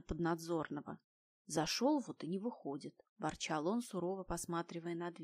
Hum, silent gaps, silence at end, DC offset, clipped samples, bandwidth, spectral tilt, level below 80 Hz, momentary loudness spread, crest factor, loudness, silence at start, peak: none; 1.04-1.45 s, 3.09-3.16 s; 0 s; under 0.1%; under 0.1%; 15.5 kHz; -4.5 dB/octave; -62 dBFS; 12 LU; 18 dB; -40 LUFS; 0.1 s; -22 dBFS